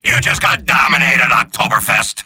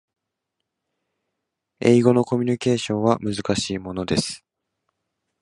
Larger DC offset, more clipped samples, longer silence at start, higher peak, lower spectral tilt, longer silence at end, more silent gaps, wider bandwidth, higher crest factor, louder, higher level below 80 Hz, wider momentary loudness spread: neither; neither; second, 0.05 s vs 1.8 s; about the same, 0 dBFS vs -2 dBFS; second, -2.5 dB/octave vs -5.5 dB/octave; second, 0.05 s vs 1.05 s; neither; first, 17 kHz vs 11 kHz; second, 14 dB vs 22 dB; first, -11 LUFS vs -21 LUFS; first, -40 dBFS vs -52 dBFS; second, 4 LU vs 11 LU